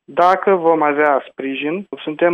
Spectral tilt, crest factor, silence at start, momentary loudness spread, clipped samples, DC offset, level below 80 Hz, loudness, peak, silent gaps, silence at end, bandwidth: -7 dB/octave; 14 dB; 0.1 s; 11 LU; under 0.1%; under 0.1%; -66 dBFS; -16 LUFS; -2 dBFS; none; 0 s; 7 kHz